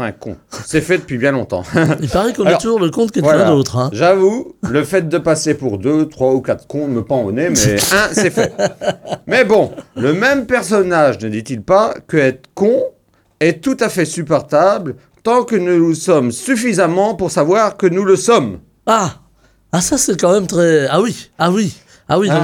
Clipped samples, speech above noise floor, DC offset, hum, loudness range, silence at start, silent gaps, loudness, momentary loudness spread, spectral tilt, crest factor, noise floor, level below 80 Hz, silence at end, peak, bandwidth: under 0.1%; 19 dB; under 0.1%; none; 2 LU; 0 s; none; -14 LUFS; 8 LU; -5 dB/octave; 14 dB; -33 dBFS; -44 dBFS; 0 s; 0 dBFS; 19 kHz